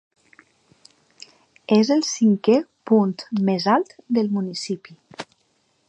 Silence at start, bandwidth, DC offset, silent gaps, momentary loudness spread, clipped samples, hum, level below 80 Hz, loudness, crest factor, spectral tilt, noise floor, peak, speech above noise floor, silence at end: 1.7 s; 8.8 kHz; under 0.1%; none; 21 LU; under 0.1%; none; -72 dBFS; -21 LUFS; 18 dB; -5.5 dB/octave; -66 dBFS; -4 dBFS; 46 dB; 0.65 s